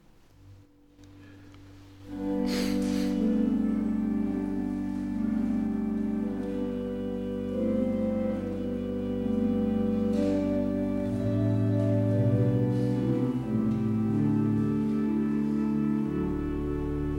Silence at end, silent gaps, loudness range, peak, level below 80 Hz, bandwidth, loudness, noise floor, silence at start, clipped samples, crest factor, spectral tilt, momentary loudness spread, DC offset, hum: 0 s; none; 4 LU; -14 dBFS; -46 dBFS; 13 kHz; -28 LUFS; -55 dBFS; 0.45 s; under 0.1%; 14 dB; -8.5 dB/octave; 6 LU; under 0.1%; none